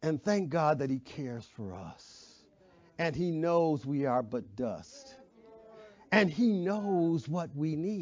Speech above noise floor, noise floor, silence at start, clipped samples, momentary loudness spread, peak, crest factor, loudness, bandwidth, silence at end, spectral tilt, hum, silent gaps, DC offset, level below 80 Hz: 31 dB; -62 dBFS; 0 s; under 0.1%; 18 LU; -12 dBFS; 20 dB; -31 LUFS; 7.6 kHz; 0 s; -7 dB/octave; none; none; under 0.1%; -66 dBFS